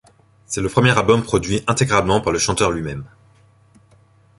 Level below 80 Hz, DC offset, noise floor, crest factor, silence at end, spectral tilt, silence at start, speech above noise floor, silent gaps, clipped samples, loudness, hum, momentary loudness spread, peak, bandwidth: -40 dBFS; under 0.1%; -53 dBFS; 18 dB; 1.3 s; -4.5 dB/octave; 0.5 s; 35 dB; none; under 0.1%; -18 LUFS; none; 11 LU; -2 dBFS; 11.5 kHz